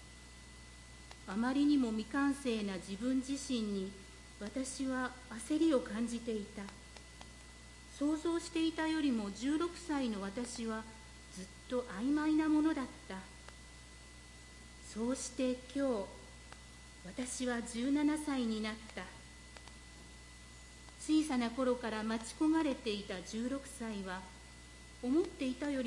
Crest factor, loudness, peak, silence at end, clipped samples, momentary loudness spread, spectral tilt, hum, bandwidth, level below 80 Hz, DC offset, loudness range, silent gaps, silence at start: 16 dB; -37 LUFS; -22 dBFS; 0 s; under 0.1%; 21 LU; -4.5 dB/octave; none; 11.5 kHz; -58 dBFS; under 0.1%; 4 LU; none; 0 s